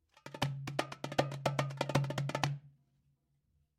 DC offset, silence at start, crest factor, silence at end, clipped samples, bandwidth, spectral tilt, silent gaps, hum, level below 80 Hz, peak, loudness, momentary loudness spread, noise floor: under 0.1%; 0.25 s; 24 dB; 1.1 s; under 0.1%; 15 kHz; -5.5 dB/octave; none; none; -68 dBFS; -14 dBFS; -37 LUFS; 5 LU; -77 dBFS